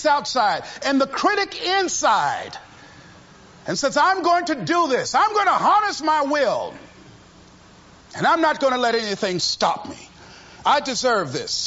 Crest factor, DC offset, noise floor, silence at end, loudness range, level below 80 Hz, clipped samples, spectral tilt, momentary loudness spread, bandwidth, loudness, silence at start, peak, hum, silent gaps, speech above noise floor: 16 dB; under 0.1%; -48 dBFS; 0 s; 3 LU; -58 dBFS; under 0.1%; -2.5 dB/octave; 10 LU; 8 kHz; -20 LUFS; 0 s; -6 dBFS; none; none; 28 dB